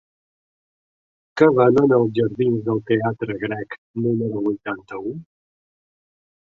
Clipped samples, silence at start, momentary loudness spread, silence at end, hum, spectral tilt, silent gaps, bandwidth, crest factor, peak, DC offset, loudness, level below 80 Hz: under 0.1%; 1.35 s; 16 LU; 1.25 s; none; -9 dB/octave; 3.78-3.94 s; 7.2 kHz; 20 dB; -2 dBFS; under 0.1%; -20 LUFS; -60 dBFS